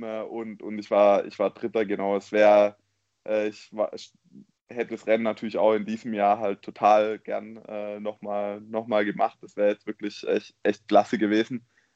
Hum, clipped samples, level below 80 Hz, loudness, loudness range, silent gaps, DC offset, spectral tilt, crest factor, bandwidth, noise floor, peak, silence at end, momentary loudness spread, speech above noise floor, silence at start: none; under 0.1%; -76 dBFS; -25 LUFS; 5 LU; 4.61-4.67 s; under 0.1%; -6 dB/octave; 20 dB; 8 kHz; -53 dBFS; -6 dBFS; 0.35 s; 14 LU; 28 dB; 0 s